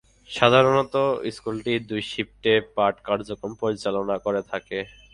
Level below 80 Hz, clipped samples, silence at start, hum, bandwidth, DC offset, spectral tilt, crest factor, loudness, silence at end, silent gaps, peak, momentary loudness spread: -56 dBFS; under 0.1%; 0.3 s; none; 11 kHz; under 0.1%; -5.5 dB/octave; 22 dB; -24 LUFS; 0.25 s; none; -2 dBFS; 12 LU